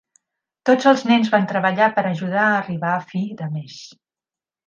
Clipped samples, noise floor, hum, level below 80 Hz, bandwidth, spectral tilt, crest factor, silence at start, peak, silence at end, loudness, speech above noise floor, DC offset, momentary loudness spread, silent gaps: under 0.1%; under -90 dBFS; none; -68 dBFS; 7.4 kHz; -6 dB/octave; 20 dB; 0.65 s; 0 dBFS; 0.8 s; -19 LUFS; over 71 dB; under 0.1%; 13 LU; none